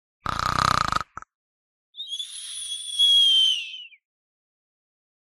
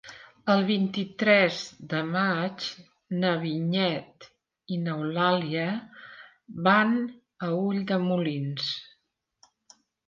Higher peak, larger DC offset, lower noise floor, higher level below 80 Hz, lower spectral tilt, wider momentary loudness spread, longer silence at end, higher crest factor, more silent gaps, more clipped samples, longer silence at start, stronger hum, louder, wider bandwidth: first, -2 dBFS vs -8 dBFS; neither; first, under -90 dBFS vs -74 dBFS; first, -48 dBFS vs -74 dBFS; second, -1 dB/octave vs -6.5 dB/octave; first, 20 LU vs 14 LU; about the same, 1.35 s vs 1.25 s; about the same, 24 dB vs 20 dB; first, 1.35-1.93 s vs none; neither; first, 0.25 s vs 0.05 s; neither; first, -20 LUFS vs -27 LUFS; first, 14 kHz vs 7.4 kHz